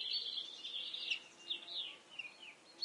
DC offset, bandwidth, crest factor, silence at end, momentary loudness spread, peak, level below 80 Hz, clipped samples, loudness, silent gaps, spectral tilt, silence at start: under 0.1%; 11.5 kHz; 18 dB; 0 s; 11 LU; -26 dBFS; under -90 dBFS; under 0.1%; -42 LUFS; none; 1 dB/octave; 0 s